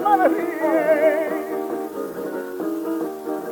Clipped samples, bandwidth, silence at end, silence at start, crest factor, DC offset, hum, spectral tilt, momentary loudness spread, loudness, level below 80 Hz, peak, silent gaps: under 0.1%; 19 kHz; 0 s; 0 s; 16 dB; under 0.1%; none; -5.5 dB/octave; 11 LU; -22 LUFS; -68 dBFS; -4 dBFS; none